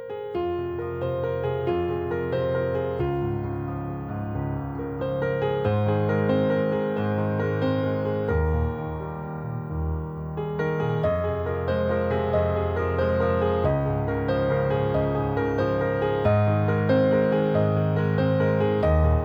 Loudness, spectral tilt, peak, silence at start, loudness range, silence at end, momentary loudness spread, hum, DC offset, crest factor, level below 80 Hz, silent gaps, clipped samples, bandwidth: -25 LUFS; -10 dB/octave; -8 dBFS; 0 s; 5 LU; 0 s; 9 LU; none; under 0.1%; 16 dB; -38 dBFS; none; under 0.1%; over 20 kHz